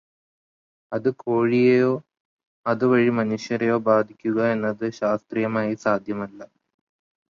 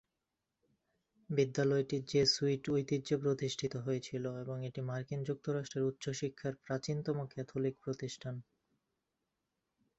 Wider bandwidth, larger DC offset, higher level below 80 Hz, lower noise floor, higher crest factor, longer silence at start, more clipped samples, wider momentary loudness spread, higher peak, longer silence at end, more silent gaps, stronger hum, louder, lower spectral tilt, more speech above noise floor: about the same, 7.4 kHz vs 8 kHz; neither; first, -66 dBFS vs -72 dBFS; about the same, under -90 dBFS vs -88 dBFS; about the same, 18 dB vs 18 dB; second, 0.9 s vs 1.3 s; neither; about the same, 11 LU vs 10 LU; first, -6 dBFS vs -18 dBFS; second, 0.9 s vs 1.55 s; first, 2.20-2.39 s, 2.47-2.64 s vs none; neither; first, -22 LUFS vs -37 LUFS; first, -7.5 dB/octave vs -5.5 dB/octave; first, over 68 dB vs 52 dB